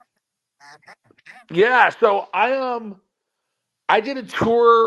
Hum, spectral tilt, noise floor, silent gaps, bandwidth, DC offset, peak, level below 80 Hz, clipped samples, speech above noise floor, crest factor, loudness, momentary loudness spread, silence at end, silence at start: none; -5.5 dB/octave; -78 dBFS; none; 8 kHz; under 0.1%; -2 dBFS; -58 dBFS; under 0.1%; 60 dB; 20 dB; -18 LUFS; 13 LU; 0 s; 1.5 s